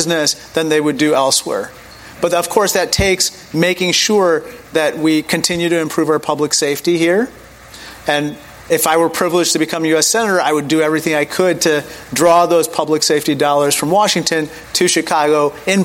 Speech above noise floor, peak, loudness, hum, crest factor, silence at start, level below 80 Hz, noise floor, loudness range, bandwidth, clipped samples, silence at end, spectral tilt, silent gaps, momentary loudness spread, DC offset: 21 dB; 0 dBFS; -14 LUFS; none; 14 dB; 0 s; -44 dBFS; -36 dBFS; 3 LU; 17 kHz; under 0.1%; 0 s; -3 dB/octave; none; 7 LU; under 0.1%